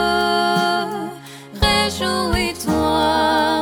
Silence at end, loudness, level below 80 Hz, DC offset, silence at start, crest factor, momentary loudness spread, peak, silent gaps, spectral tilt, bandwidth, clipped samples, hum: 0 s; -18 LUFS; -34 dBFS; under 0.1%; 0 s; 16 dB; 11 LU; -2 dBFS; none; -4 dB/octave; over 20 kHz; under 0.1%; none